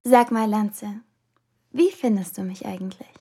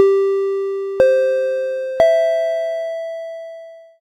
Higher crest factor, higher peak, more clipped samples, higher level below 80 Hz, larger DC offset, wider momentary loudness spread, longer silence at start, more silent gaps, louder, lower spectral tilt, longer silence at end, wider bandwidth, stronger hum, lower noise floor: about the same, 20 dB vs 18 dB; about the same, -2 dBFS vs 0 dBFS; neither; second, -74 dBFS vs -56 dBFS; neither; about the same, 17 LU vs 16 LU; about the same, 0.05 s vs 0 s; neither; second, -23 LUFS vs -18 LUFS; about the same, -6 dB/octave vs -5 dB/octave; about the same, 0.25 s vs 0.2 s; first, 16 kHz vs 10.5 kHz; neither; first, -70 dBFS vs -37 dBFS